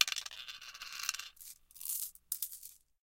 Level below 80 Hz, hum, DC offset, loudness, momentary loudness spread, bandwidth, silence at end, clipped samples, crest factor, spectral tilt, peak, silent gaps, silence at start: -74 dBFS; none; under 0.1%; -40 LUFS; 12 LU; 17 kHz; 0.25 s; under 0.1%; 36 dB; 4 dB/octave; -6 dBFS; none; 0 s